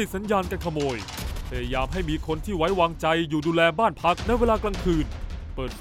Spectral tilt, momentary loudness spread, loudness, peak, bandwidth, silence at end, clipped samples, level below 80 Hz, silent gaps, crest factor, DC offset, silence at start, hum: -5.5 dB/octave; 12 LU; -25 LUFS; -8 dBFS; 16 kHz; 0 s; under 0.1%; -34 dBFS; none; 18 dB; under 0.1%; 0 s; none